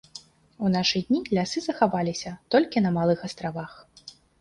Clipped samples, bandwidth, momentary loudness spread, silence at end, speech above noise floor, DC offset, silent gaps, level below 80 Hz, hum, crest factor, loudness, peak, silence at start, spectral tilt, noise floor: under 0.1%; 11 kHz; 22 LU; 0.3 s; 24 dB; under 0.1%; none; -58 dBFS; none; 20 dB; -25 LUFS; -6 dBFS; 0.15 s; -5.5 dB/octave; -49 dBFS